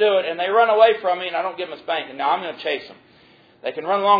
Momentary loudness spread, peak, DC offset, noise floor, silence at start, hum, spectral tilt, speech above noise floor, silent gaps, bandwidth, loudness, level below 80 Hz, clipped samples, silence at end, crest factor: 13 LU; -2 dBFS; under 0.1%; -52 dBFS; 0 s; none; -5.5 dB/octave; 33 dB; none; 5 kHz; -21 LUFS; -70 dBFS; under 0.1%; 0 s; 18 dB